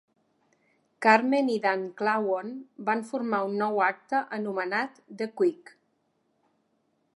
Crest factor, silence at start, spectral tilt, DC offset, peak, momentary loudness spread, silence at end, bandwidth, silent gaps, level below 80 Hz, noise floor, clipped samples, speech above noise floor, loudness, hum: 24 dB; 1 s; -5.5 dB/octave; under 0.1%; -4 dBFS; 11 LU; 1.6 s; 11.5 kHz; none; -86 dBFS; -73 dBFS; under 0.1%; 46 dB; -27 LUFS; none